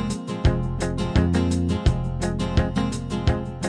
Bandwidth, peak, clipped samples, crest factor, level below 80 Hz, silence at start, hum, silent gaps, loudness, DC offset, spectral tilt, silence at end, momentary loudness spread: 10 kHz; -6 dBFS; under 0.1%; 16 dB; -28 dBFS; 0 s; none; none; -24 LUFS; under 0.1%; -6.5 dB/octave; 0 s; 5 LU